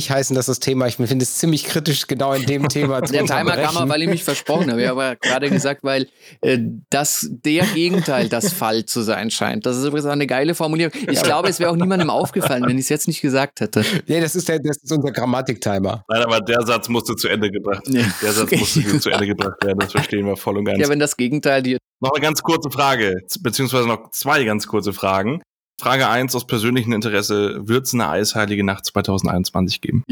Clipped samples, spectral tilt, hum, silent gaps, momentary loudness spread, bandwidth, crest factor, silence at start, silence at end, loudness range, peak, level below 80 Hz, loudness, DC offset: under 0.1%; -4.5 dB/octave; none; 21.87-21.98 s, 25.52-25.57 s, 25.66-25.71 s; 4 LU; over 20 kHz; 18 dB; 0 s; 0.1 s; 1 LU; 0 dBFS; -54 dBFS; -19 LUFS; under 0.1%